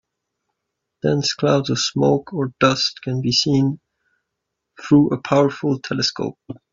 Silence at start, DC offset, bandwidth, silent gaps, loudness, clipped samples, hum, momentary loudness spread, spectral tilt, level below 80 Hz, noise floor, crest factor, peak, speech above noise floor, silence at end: 1.05 s; under 0.1%; 7.6 kHz; none; -19 LUFS; under 0.1%; none; 10 LU; -5 dB/octave; -56 dBFS; -79 dBFS; 18 dB; -2 dBFS; 60 dB; 0.15 s